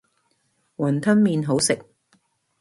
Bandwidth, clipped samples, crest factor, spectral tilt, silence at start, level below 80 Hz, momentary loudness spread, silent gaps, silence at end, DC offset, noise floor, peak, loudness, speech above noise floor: 11.5 kHz; under 0.1%; 18 dB; -5 dB/octave; 0.8 s; -62 dBFS; 8 LU; none; 0.8 s; under 0.1%; -68 dBFS; -6 dBFS; -21 LUFS; 49 dB